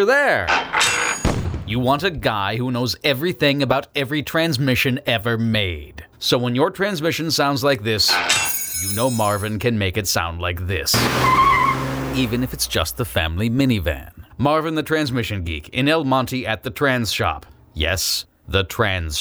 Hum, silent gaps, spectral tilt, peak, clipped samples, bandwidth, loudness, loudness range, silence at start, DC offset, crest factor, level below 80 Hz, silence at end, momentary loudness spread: none; none; -4 dB/octave; -2 dBFS; under 0.1%; over 20 kHz; -19 LUFS; 3 LU; 0 s; under 0.1%; 18 dB; -38 dBFS; 0 s; 8 LU